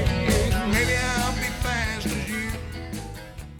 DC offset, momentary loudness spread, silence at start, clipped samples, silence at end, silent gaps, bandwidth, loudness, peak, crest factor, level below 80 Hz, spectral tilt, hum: under 0.1%; 13 LU; 0 s; under 0.1%; 0 s; none; 19 kHz; -25 LUFS; -10 dBFS; 14 dB; -32 dBFS; -4.5 dB/octave; none